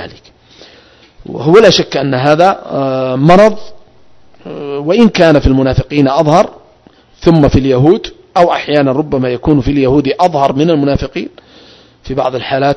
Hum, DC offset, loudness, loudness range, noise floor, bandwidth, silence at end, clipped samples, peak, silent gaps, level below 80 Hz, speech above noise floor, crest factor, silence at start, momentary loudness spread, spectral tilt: none; under 0.1%; -10 LUFS; 2 LU; -46 dBFS; 11 kHz; 0 s; 2%; 0 dBFS; none; -30 dBFS; 37 dB; 10 dB; 0 s; 12 LU; -6.5 dB/octave